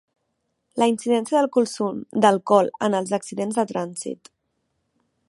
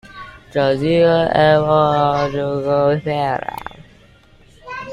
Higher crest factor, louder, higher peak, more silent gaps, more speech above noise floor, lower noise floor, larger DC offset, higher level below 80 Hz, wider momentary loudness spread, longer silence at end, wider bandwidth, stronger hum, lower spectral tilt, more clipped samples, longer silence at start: about the same, 20 dB vs 16 dB; second, -22 LUFS vs -16 LUFS; about the same, -2 dBFS vs -2 dBFS; neither; first, 53 dB vs 33 dB; first, -75 dBFS vs -48 dBFS; neither; second, -72 dBFS vs -46 dBFS; second, 12 LU vs 19 LU; first, 1.15 s vs 0 s; second, 11.5 kHz vs 15 kHz; neither; second, -5 dB/octave vs -7.5 dB/octave; neither; first, 0.75 s vs 0.05 s